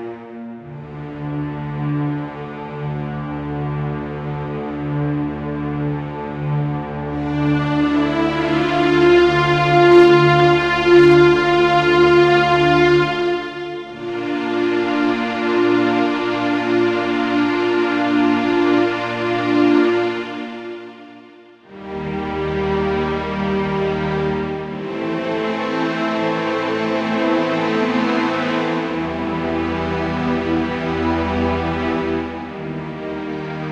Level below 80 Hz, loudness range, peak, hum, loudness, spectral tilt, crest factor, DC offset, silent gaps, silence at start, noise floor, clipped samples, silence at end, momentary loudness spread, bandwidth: -42 dBFS; 12 LU; 0 dBFS; none; -18 LUFS; -7 dB/octave; 18 dB; under 0.1%; none; 0 s; -44 dBFS; under 0.1%; 0 s; 15 LU; 7.8 kHz